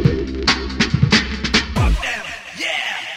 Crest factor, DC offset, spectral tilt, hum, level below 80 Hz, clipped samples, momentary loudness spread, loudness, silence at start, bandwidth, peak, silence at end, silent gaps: 16 dB; under 0.1%; -4.5 dB/octave; none; -26 dBFS; under 0.1%; 8 LU; -18 LUFS; 0 s; 15 kHz; -2 dBFS; 0 s; none